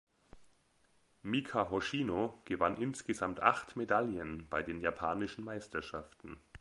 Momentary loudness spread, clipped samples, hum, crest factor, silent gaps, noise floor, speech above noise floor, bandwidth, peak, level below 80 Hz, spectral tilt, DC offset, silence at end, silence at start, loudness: 14 LU; under 0.1%; none; 28 dB; none; -72 dBFS; 36 dB; 11.5 kHz; -10 dBFS; -62 dBFS; -5.5 dB/octave; under 0.1%; 0.05 s; 0.35 s; -36 LUFS